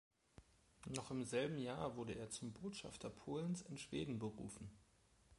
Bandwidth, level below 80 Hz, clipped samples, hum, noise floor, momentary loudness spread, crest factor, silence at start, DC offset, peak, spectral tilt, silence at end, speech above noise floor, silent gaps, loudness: 11.5 kHz; -70 dBFS; under 0.1%; none; -72 dBFS; 10 LU; 22 dB; 0.4 s; under 0.1%; -26 dBFS; -5 dB/octave; 0.05 s; 25 dB; none; -47 LUFS